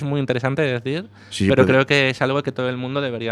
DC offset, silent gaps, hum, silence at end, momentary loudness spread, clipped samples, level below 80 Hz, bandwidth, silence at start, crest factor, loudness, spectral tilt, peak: under 0.1%; none; none; 0 s; 10 LU; under 0.1%; -52 dBFS; 12 kHz; 0 s; 18 dB; -20 LUFS; -6 dB/octave; -2 dBFS